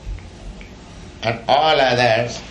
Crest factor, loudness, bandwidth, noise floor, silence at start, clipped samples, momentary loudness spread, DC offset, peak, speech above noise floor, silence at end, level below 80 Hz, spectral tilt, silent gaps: 16 dB; -17 LUFS; 10.5 kHz; -38 dBFS; 0 s; under 0.1%; 24 LU; under 0.1%; -2 dBFS; 21 dB; 0 s; -38 dBFS; -4.5 dB/octave; none